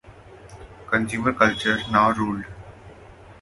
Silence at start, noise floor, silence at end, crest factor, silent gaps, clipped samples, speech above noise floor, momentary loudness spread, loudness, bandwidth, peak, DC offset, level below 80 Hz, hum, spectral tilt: 0.05 s; -45 dBFS; 0.1 s; 24 dB; none; under 0.1%; 24 dB; 20 LU; -21 LUFS; 11.5 kHz; 0 dBFS; under 0.1%; -48 dBFS; none; -5 dB/octave